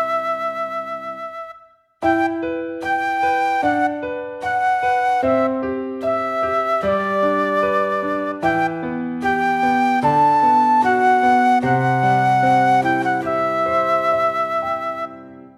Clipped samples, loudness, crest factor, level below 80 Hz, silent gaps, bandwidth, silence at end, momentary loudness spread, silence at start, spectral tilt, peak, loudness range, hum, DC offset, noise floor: under 0.1%; -18 LUFS; 14 dB; -54 dBFS; none; 12.5 kHz; 0.1 s; 11 LU; 0 s; -6.5 dB/octave; -4 dBFS; 6 LU; none; under 0.1%; -49 dBFS